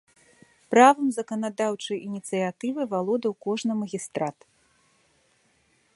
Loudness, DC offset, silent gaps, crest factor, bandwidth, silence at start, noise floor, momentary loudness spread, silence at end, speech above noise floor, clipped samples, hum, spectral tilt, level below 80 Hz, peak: -25 LUFS; under 0.1%; none; 24 dB; 11.5 kHz; 0.7 s; -66 dBFS; 14 LU; 1.65 s; 41 dB; under 0.1%; none; -5 dB/octave; -76 dBFS; -2 dBFS